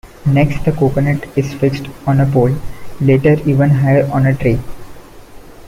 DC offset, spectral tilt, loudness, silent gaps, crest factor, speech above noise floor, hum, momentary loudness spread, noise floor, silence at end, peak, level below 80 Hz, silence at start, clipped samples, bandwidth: under 0.1%; -8.5 dB/octave; -14 LUFS; none; 12 dB; 22 dB; none; 9 LU; -35 dBFS; 0 s; -2 dBFS; -34 dBFS; 0.05 s; under 0.1%; 14.5 kHz